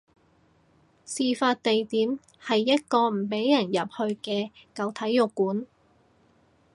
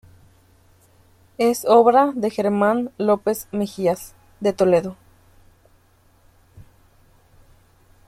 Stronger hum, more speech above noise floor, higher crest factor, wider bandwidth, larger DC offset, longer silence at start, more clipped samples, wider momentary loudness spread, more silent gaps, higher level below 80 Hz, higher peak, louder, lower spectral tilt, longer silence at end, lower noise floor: neither; about the same, 37 dB vs 38 dB; about the same, 20 dB vs 20 dB; second, 11.5 kHz vs 15.5 kHz; neither; second, 1.1 s vs 1.4 s; neither; about the same, 10 LU vs 11 LU; neither; second, -74 dBFS vs -58 dBFS; second, -8 dBFS vs -2 dBFS; second, -26 LUFS vs -19 LUFS; second, -4.5 dB/octave vs -6 dB/octave; second, 1.1 s vs 1.45 s; first, -63 dBFS vs -57 dBFS